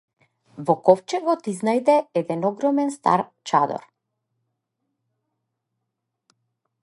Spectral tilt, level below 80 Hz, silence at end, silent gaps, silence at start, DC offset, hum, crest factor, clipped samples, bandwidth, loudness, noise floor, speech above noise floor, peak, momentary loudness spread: -6 dB/octave; -76 dBFS; 3.05 s; none; 0.55 s; under 0.1%; none; 22 dB; under 0.1%; 11.5 kHz; -22 LUFS; -80 dBFS; 59 dB; -2 dBFS; 7 LU